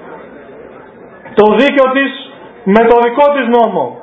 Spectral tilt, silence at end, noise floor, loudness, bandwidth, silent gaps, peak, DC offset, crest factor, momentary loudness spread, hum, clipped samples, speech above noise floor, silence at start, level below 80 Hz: -7.5 dB/octave; 0 s; -35 dBFS; -10 LUFS; 8 kHz; none; 0 dBFS; under 0.1%; 12 dB; 15 LU; none; 0.4%; 26 dB; 0 s; -48 dBFS